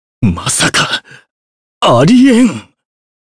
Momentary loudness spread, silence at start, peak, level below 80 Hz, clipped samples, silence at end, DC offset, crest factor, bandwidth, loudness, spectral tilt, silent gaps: 9 LU; 0.2 s; 0 dBFS; -38 dBFS; under 0.1%; 0.7 s; under 0.1%; 12 dB; 11 kHz; -10 LUFS; -4.5 dB/octave; 1.31-1.81 s